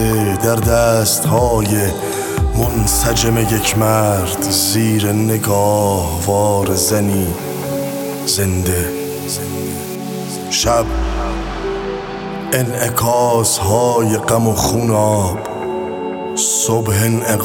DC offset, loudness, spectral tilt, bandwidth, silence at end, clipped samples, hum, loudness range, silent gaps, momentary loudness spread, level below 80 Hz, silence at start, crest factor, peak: under 0.1%; -16 LUFS; -4.5 dB/octave; 18 kHz; 0 s; under 0.1%; none; 5 LU; none; 9 LU; -30 dBFS; 0 s; 16 dB; 0 dBFS